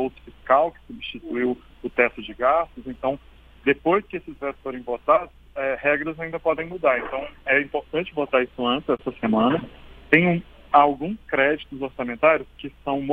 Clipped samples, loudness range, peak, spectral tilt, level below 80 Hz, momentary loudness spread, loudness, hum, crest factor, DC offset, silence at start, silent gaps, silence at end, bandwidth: under 0.1%; 3 LU; 0 dBFS; -8 dB/octave; -50 dBFS; 13 LU; -23 LUFS; none; 22 dB; under 0.1%; 0 s; none; 0 s; 4.8 kHz